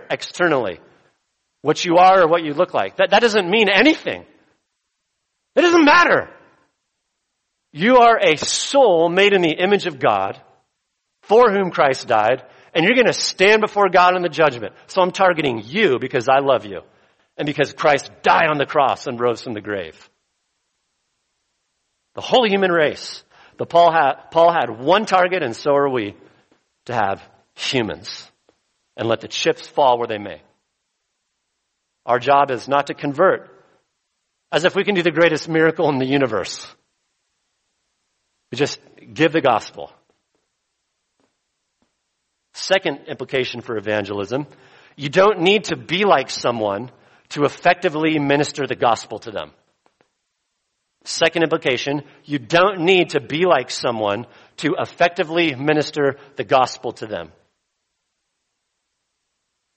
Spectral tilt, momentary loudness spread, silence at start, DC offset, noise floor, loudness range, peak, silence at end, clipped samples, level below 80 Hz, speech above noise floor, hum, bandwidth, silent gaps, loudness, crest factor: -4 dB/octave; 16 LU; 0 s; under 0.1%; -75 dBFS; 8 LU; 0 dBFS; 2.5 s; under 0.1%; -62 dBFS; 57 dB; none; 8.4 kHz; none; -17 LUFS; 20 dB